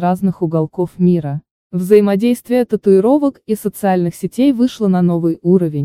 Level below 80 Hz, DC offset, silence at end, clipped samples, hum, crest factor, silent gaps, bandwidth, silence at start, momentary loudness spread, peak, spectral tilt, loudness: -54 dBFS; under 0.1%; 0 s; under 0.1%; none; 14 dB; 1.51-1.70 s; 15.5 kHz; 0 s; 9 LU; 0 dBFS; -8 dB/octave; -15 LUFS